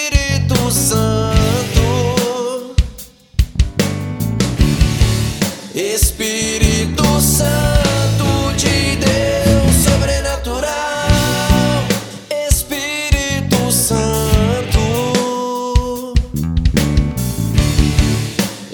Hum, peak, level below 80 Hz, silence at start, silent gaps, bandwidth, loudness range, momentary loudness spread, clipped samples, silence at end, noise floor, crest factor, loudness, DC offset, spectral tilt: none; 0 dBFS; -22 dBFS; 0 s; none; 19.5 kHz; 3 LU; 7 LU; under 0.1%; 0 s; -35 dBFS; 14 dB; -15 LUFS; under 0.1%; -4.5 dB/octave